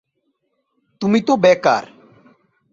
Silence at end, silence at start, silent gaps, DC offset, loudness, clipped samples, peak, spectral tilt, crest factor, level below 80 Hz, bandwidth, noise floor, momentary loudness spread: 0.85 s; 1 s; none; under 0.1%; -16 LUFS; under 0.1%; -2 dBFS; -5.5 dB/octave; 18 dB; -62 dBFS; 7.6 kHz; -70 dBFS; 8 LU